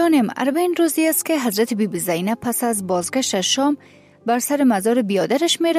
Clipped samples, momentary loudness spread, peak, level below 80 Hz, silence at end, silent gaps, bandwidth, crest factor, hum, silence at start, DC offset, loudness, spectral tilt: under 0.1%; 4 LU; -6 dBFS; -66 dBFS; 0 s; none; 15.5 kHz; 12 dB; none; 0 s; under 0.1%; -19 LUFS; -3.5 dB/octave